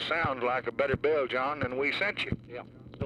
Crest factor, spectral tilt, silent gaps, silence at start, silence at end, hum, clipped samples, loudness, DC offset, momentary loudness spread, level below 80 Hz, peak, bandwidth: 16 dB; -6 dB/octave; none; 0 s; 0 s; none; under 0.1%; -30 LUFS; under 0.1%; 13 LU; -54 dBFS; -14 dBFS; 11.5 kHz